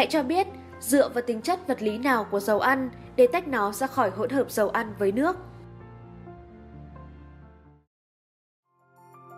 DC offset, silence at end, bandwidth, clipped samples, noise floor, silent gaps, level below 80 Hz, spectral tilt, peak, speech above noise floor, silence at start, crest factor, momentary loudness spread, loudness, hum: under 0.1%; 0 s; 16 kHz; under 0.1%; -57 dBFS; 7.87-8.63 s; -56 dBFS; -4.5 dB/octave; -8 dBFS; 32 dB; 0 s; 20 dB; 23 LU; -25 LUFS; none